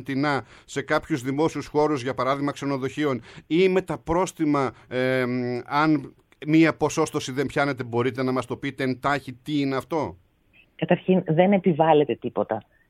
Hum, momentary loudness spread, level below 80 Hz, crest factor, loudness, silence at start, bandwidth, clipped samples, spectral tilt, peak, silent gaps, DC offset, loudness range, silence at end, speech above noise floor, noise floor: none; 9 LU; -56 dBFS; 20 dB; -24 LUFS; 0 s; 14.5 kHz; under 0.1%; -6 dB/octave; -4 dBFS; none; under 0.1%; 3 LU; 0.3 s; 36 dB; -59 dBFS